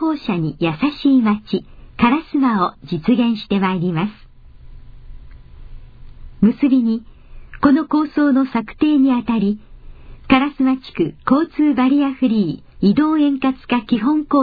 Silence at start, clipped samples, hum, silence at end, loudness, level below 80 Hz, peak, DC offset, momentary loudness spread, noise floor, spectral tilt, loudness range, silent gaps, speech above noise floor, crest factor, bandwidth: 0 s; under 0.1%; none; 0 s; -17 LUFS; -42 dBFS; -2 dBFS; under 0.1%; 7 LU; -40 dBFS; -9.5 dB/octave; 5 LU; none; 24 dB; 16 dB; 5 kHz